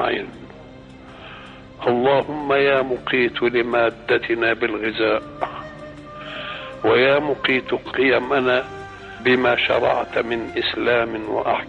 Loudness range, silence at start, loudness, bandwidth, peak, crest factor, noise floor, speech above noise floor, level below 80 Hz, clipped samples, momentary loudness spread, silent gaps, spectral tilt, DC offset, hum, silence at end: 3 LU; 0 s; -20 LUFS; 7.8 kHz; -6 dBFS; 16 dB; -41 dBFS; 21 dB; -50 dBFS; under 0.1%; 19 LU; none; -6.5 dB/octave; under 0.1%; none; 0 s